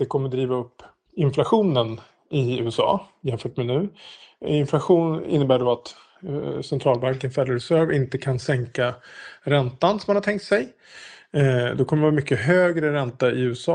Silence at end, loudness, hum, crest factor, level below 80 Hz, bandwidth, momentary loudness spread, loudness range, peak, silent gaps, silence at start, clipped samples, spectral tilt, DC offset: 0 s; -22 LUFS; none; 18 dB; -58 dBFS; 10 kHz; 12 LU; 2 LU; -4 dBFS; none; 0 s; under 0.1%; -7 dB/octave; under 0.1%